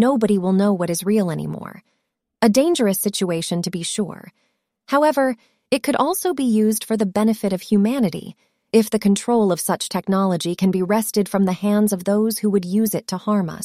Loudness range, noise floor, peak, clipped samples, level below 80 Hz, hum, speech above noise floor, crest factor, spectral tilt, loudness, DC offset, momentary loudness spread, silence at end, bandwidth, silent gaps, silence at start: 2 LU; -74 dBFS; -4 dBFS; under 0.1%; -60 dBFS; none; 55 dB; 16 dB; -5.5 dB/octave; -20 LUFS; under 0.1%; 7 LU; 0 s; 15.5 kHz; none; 0 s